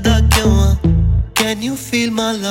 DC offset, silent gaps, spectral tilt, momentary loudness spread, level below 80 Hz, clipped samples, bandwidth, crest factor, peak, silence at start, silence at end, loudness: under 0.1%; none; -5 dB/octave; 6 LU; -20 dBFS; under 0.1%; 16.5 kHz; 12 dB; -2 dBFS; 0 s; 0 s; -15 LUFS